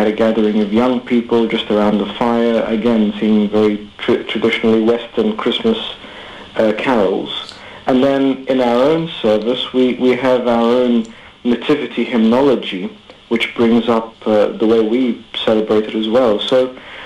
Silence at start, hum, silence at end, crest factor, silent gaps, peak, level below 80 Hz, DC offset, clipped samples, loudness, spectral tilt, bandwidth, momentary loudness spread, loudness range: 0 s; none; 0 s; 10 dB; none; -6 dBFS; -50 dBFS; under 0.1%; under 0.1%; -15 LUFS; -6.5 dB/octave; 9.8 kHz; 8 LU; 2 LU